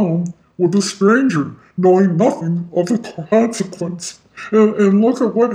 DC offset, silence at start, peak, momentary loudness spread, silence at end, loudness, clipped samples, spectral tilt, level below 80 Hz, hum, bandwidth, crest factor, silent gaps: under 0.1%; 0 s; -2 dBFS; 12 LU; 0 s; -16 LUFS; under 0.1%; -6.5 dB/octave; -62 dBFS; none; 11 kHz; 14 dB; none